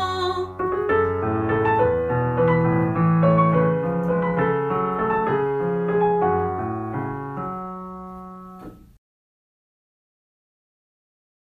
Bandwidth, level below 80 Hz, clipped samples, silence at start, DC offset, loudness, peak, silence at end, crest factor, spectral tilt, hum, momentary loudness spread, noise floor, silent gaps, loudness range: 7.6 kHz; -48 dBFS; under 0.1%; 0 s; under 0.1%; -21 LUFS; -6 dBFS; 2.75 s; 16 dB; -9 dB/octave; none; 16 LU; -41 dBFS; none; 15 LU